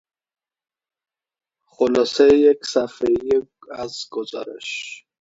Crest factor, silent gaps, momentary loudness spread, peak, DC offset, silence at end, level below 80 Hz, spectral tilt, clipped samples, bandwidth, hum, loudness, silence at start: 20 dB; none; 16 LU; -2 dBFS; under 0.1%; 0.25 s; -56 dBFS; -4 dB/octave; under 0.1%; 8 kHz; none; -19 LUFS; 1.8 s